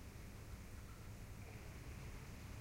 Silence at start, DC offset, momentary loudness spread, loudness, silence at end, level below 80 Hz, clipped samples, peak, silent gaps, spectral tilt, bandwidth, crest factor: 0 s; under 0.1%; 2 LU; -55 LUFS; 0 s; -56 dBFS; under 0.1%; -40 dBFS; none; -5 dB/octave; 16 kHz; 12 dB